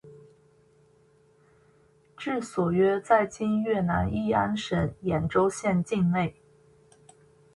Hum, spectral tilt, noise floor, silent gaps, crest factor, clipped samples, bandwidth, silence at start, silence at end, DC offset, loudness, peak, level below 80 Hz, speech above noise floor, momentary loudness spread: none; -6.5 dB/octave; -61 dBFS; none; 20 dB; under 0.1%; 11.5 kHz; 0.05 s; 1.25 s; under 0.1%; -26 LUFS; -8 dBFS; -50 dBFS; 36 dB; 6 LU